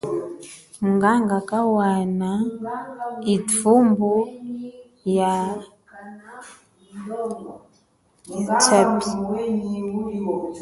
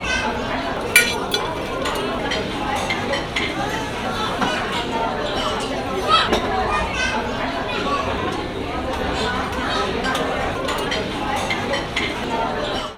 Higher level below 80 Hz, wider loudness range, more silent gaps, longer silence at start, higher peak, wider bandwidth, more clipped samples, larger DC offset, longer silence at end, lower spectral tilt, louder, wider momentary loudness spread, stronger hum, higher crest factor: second, -60 dBFS vs -36 dBFS; first, 8 LU vs 2 LU; neither; about the same, 0.05 s vs 0 s; about the same, -2 dBFS vs -2 dBFS; second, 11.5 kHz vs over 20 kHz; neither; neither; about the same, 0 s vs 0 s; first, -5 dB/octave vs -3.5 dB/octave; about the same, -21 LUFS vs -21 LUFS; first, 22 LU vs 7 LU; neither; about the same, 20 dB vs 20 dB